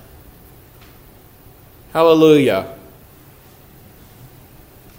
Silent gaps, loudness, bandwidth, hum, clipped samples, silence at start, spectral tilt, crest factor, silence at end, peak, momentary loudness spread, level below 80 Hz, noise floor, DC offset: none; -13 LUFS; 16 kHz; none; under 0.1%; 1.95 s; -6 dB/octave; 20 dB; 2.25 s; 0 dBFS; 14 LU; -50 dBFS; -45 dBFS; under 0.1%